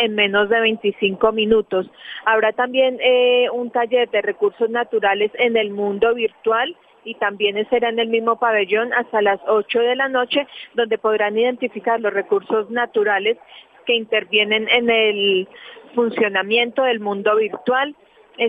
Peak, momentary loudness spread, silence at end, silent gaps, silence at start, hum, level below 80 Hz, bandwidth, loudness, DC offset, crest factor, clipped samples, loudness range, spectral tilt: 0 dBFS; 7 LU; 0 s; none; 0 s; none; -60 dBFS; 3.9 kHz; -18 LUFS; under 0.1%; 18 dB; under 0.1%; 2 LU; -6.5 dB/octave